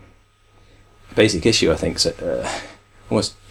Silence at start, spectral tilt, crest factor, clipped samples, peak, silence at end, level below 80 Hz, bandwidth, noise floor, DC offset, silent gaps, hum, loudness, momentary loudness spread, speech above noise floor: 1.1 s; -4 dB/octave; 20 dB; under 0.1%; -2 dBFS; 0.2 s; -42 dBFS; 15.5 kHz; -53 dBFS; under 0.1%; none; none; -20 LUFS; 11 LU; 34 dB